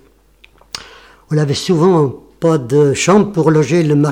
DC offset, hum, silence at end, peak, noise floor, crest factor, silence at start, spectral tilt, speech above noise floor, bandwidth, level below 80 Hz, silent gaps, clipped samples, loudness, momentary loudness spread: under 0.1%; none; 0 s; 0 dBFS; -48 dBFS; 14 dB; 0.75 s; -6 dB/octave; 37 dB; 12.5 kHz; -48 dBFS; none; under 0.1%; -13 LUFS; 17 LU